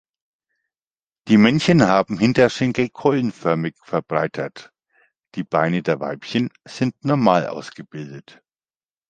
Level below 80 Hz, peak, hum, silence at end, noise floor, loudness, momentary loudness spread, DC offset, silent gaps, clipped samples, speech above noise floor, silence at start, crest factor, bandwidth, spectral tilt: -56 dBFS; 0 dBFS; none; 0.9 s; under -90 dBFS; -19 LUFS; 18 LU; under 0.1%; none; under 0.1%; over 71 dB; 1.25 s; 20 dB; 9 kHz; -6.5 dB/octave